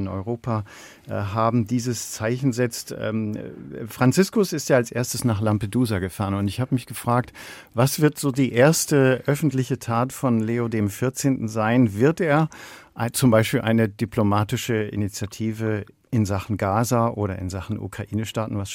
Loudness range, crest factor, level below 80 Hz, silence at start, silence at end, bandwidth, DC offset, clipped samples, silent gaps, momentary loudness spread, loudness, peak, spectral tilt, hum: 4 LU; 18 dB; -56 dBFS; 0 s; 0 s; 16.5 kHz; under 0.1%; under 0.1%; none; 11 LU; -23 LUFS; -4 dBFS; -6 dB/octave; none